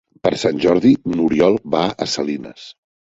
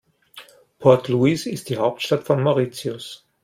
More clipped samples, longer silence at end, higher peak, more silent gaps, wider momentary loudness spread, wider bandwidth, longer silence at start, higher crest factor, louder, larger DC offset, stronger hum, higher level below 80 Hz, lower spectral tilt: neither; about the same, 0.4 s vs 0.3 s; about the same, -2 dBFS vs -2 dBFS; neither; second, 9 LU vs 13 LU; second, 8 kHz vs 16 kHz; about the same, 0.25 s vs 0.35 s; about the same, 16 dB vs 18 dB; first, -17 LUFS vs -20 LUFS; neither; neither; first, -50 dBFS vs -62 dBFS; about the same, -5.5 dB/octave vs -6.5 dB/octave